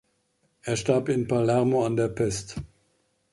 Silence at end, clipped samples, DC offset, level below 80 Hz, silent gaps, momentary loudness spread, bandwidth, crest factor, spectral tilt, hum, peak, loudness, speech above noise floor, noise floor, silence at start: 0.65 s; under 0.1%; under 0.1%; -52 dBFS; none; 15 LU; 11.5 kHz; 18 dB; -6 dB/octave; none; -8 dBFS; -25 LUFS; 46 dB; -70 dBFS; 0.65 s